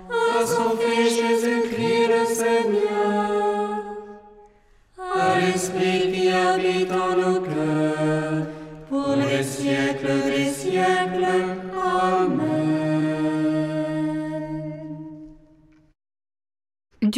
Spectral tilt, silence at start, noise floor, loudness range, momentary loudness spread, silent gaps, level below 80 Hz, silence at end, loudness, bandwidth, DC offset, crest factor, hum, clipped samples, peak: -5 dB/octave; 0 s; -55 dBFS; 5 LU; 10 LU; none; -56 dBFS; 0 s; -22 LUFS; 15.5 kHz; under 0.1%; 14 dB; none; under 0.1%; -8 dBFS